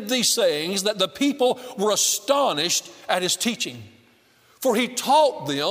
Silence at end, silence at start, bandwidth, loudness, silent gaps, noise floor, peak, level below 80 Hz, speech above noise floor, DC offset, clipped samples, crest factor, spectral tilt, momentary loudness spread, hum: 0 s; 0 s; 16 kHz; -21 LUFS; none; -57 dBFS; -4 dBFS; -72 dBFS; 35 dB; under 0.1%; under 0.1%; 18 dB; -2 dB/octave; 7 LU; none